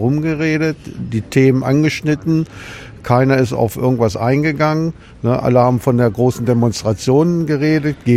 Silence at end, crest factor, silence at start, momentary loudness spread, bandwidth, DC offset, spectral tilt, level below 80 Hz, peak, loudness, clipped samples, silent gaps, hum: 0 s; 14 dB; 0 s; 10 LU; 15.5 kHz; under 0.1%; -7 dB/octave; -42 dBFS; 0 dBFS; -15 LUFS; under 0.1%; none; none